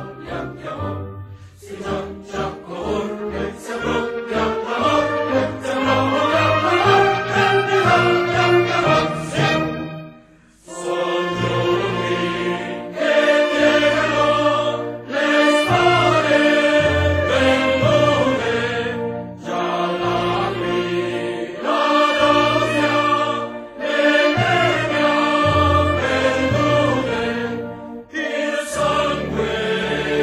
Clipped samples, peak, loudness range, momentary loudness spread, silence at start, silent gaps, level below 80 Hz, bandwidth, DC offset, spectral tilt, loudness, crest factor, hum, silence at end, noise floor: under 0.1%; -2 dBFS; 6 LU; 12 LU; 0 s; none; -44 dBFS; 15 kHz; under 0.1%; -5 dB/octave; -18 LUFS; 18 dB; none; 0 s; -49 dBFS